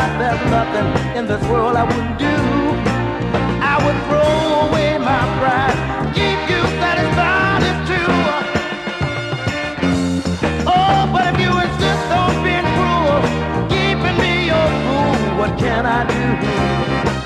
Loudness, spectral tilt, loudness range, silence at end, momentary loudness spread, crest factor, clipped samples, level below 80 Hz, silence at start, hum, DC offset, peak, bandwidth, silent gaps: -16 LUFS; -6 dB/octave; 2 LU; 0 s; 5 LU; 14 dB; under 0.1%; -32 dBFS; 0 s; none; under 0.1%; -2 dBFS; 12.5 kHz; none